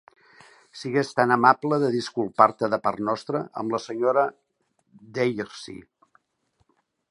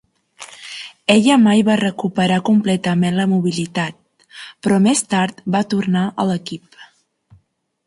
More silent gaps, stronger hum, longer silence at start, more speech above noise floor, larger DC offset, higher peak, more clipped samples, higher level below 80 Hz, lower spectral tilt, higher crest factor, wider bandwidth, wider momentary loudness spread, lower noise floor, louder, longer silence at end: neither; neither; first, 0.75 s vs 0.4 s; about the same, 48 dB vs 46 dB; neither; about the same, -2 dBFS vs 0 dBFS; neither; second, -70 dBFS vs -58 dBFS; about the same, -6 dB/octave vs -5.5 dB/octave; first, 24 dB vs 18 dB; about the same, 11.5 kHz vs 11.5 kHz; about the same, 17 LU vs 19 LU; first, -71 dBFS vs -62 dBFS; second, -23 LUFS vs -17 LUFS; first, 1.3 s vs 1.05 s